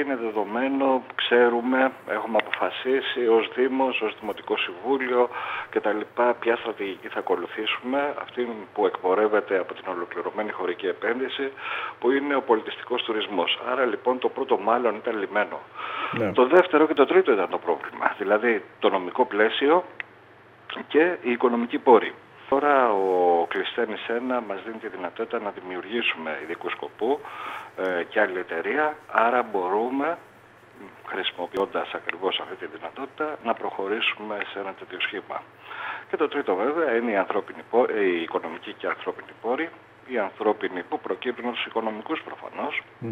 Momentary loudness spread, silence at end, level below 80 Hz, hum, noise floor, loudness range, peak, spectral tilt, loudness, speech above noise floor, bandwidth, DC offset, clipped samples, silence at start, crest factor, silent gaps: 12 LU; 0 s; -74 dBFS; none; -51 dBFS; 7 LU; -4 dBFS; -6 dB/octave; -25 LUFS; 26 dB; 5.8 kHz; under 0.1%; under 0.1%; 0 s; 22 dB; none